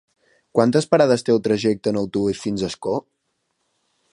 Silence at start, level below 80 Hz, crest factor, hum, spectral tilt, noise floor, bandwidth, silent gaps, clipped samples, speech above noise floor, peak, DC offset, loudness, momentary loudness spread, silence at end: 0.55 s; -56 dBFS; 20 dB; none; -6 dB/octave; -73 dBFS; 11.5 kHz; none; under 0.1%; 53 dB; -2 dBFS; under 0.1%; -20 LUFS; 9 LU; 1.15 s